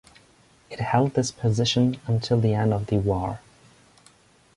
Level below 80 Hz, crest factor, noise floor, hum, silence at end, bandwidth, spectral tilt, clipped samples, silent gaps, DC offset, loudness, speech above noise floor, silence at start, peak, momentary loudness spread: -48 dBFS; 18 dB; -57 dBFS; none; 1.2 s; 11.5 kHz; -6 dB/octave; under 0.1%; none; under 0.1%; -24 LUFS; 34 dB; 0.7 s; -6 dBFS; 11 LU